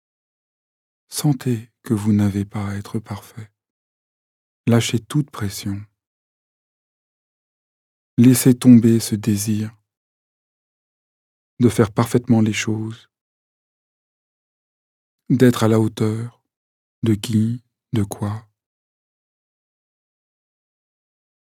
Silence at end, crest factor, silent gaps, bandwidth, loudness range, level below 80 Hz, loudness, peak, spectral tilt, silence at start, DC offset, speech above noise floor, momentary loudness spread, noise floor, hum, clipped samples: 3.2 s; 20 dB; 3.70-4.64 s, 6.07-8.17 s, 9.97-11.57 s, 13.21-15.18 s, 16.57-17.02 s; 17.5 kHz; 8 LU; -60 dBFS; -19 LUFS; 0 dBFS; -6 dB/octave; 1.1 s; under 0.1%; over 73 dB; 16 LU; under -90 dBFS; none; under 0.1%